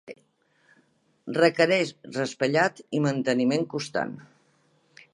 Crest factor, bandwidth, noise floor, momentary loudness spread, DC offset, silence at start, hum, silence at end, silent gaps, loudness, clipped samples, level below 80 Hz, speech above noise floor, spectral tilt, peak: 22 dB; 11.5 kHz; -66 dBFS; 12 LU; under 0.1%; 0.1 s; none; 0.9 s; none; -25 LUFS; under 0.1%; -74 dBFS; 41 dB; -5.5 dB/octave; -4 dBFS